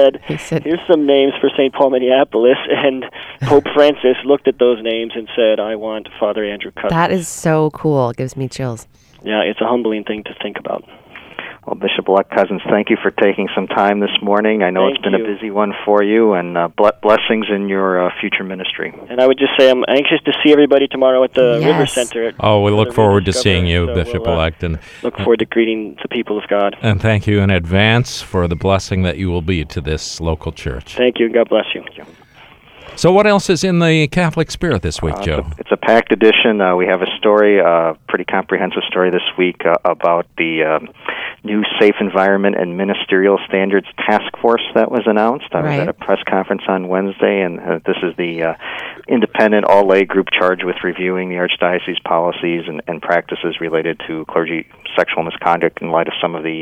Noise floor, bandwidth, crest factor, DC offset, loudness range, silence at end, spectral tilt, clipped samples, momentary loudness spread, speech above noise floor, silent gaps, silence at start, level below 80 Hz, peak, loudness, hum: -43 dBFS; 13.5 kHz; 14 dB; under 0.1%; 5 LU; 0 s; -5.5 dB/octave; under 0.1%; 10 LU; 29 dB; none; 0 s; -38 dBFS; 0 dBFS; -15 LUFS; none